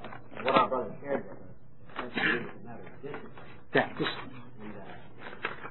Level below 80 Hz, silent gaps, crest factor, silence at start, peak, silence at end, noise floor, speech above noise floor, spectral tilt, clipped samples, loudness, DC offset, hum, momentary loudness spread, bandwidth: -64 dBFS; none; 24 dB; 0 s; -10 dBFS; 0 s; -53 dBFS; 21 dB; -8 dB/octave; under 0.1%; -31 LUFS; 0.8%; none; 20 LU; 4.3 kHz